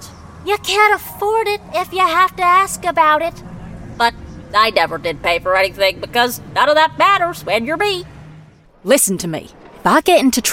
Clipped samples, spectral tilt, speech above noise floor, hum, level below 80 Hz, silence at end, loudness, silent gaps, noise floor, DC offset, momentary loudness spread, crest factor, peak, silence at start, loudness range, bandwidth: under 0.1%; -2.5 dB/octave; 28 dB; none; -44 dBFS; 0 s; -15 LUFS; none; -43 dBFS; under 0.1%; 12 LU; 16 dB; 0 dBFS; 0 s; 2 LU; 17 kHz